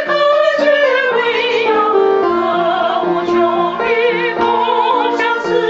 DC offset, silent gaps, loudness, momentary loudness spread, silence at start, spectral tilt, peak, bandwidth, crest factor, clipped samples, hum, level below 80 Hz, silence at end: under 0.1%; none; -13 LUFS; 3 LU; 0 s; -1.5 dB/octave; -2 dBFS; 7.8 kHz; 12 dB; under 0.1%; none; -54 dBFS; 0 s